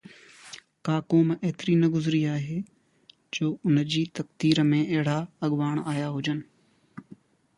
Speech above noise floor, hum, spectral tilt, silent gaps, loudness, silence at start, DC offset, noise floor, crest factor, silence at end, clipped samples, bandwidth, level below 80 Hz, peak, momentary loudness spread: 35 dB; none; -6.5 dB/octave; none; -26 LUFS; 0.45 s; under 0.1%; -60 dBFS; 20 dB; 0.45 s; under 0.1%; 11 kHz; -68 dBFS; -6 dBFS; 13 LU